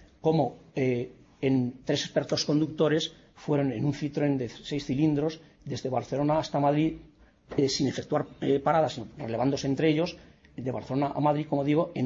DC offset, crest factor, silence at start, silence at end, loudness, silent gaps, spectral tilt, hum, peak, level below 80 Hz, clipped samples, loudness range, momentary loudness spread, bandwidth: under 0.1%; 16 dB; 0.25 s; 0 s; -28 LUFS; none; -6 dB/octave; none; -12 dBFS; -58 dBFS; under 0.1%; 1 LU; 9 LU; 7.8 kHz